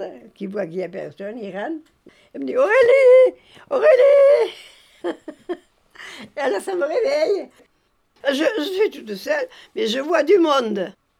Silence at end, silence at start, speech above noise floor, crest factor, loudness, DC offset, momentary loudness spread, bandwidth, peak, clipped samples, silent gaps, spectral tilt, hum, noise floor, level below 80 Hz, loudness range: 0.3 s; 0 s; 46 dB; 16 dB; -18 LUFS; under 0.1%; 21 LU; 14 kHz; -4 dBFS; under 0.1%; none; -4.5 dB/octave; none; -65 dBFS; -68 dBFS; 9 LU